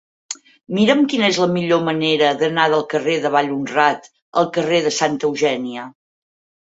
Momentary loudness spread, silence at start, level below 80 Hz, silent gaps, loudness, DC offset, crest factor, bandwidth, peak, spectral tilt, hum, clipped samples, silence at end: 14 LU; 0.3 s; -64 dBFS; 4.22-4.32 s; -17 LUFS; under 0.1%; 16 dB; 8 kHz; -2 dBFS; -4.5 dB/octave; none; under 0.1%; 0.85 s